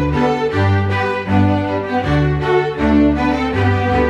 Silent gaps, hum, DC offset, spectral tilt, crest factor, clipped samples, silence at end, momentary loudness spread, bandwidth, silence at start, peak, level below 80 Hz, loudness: none; none; under 0.1%; -8 dB/octave; 12 dB; under 0.1%; 0 s; 4 LU; 8 kHz; 0 s; -2 dBFS; -30 dBFS; -16 LUFS